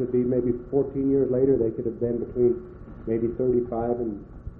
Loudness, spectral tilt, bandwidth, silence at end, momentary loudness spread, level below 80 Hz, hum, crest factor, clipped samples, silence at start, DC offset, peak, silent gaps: -25 LUFS; -14 dB/octave; 2.6 kHz; 0 s; 10 LU; -46 dBFS; none; 14 dB; under 0.1%; 0 s; under 0.1%; -10 dBFS; none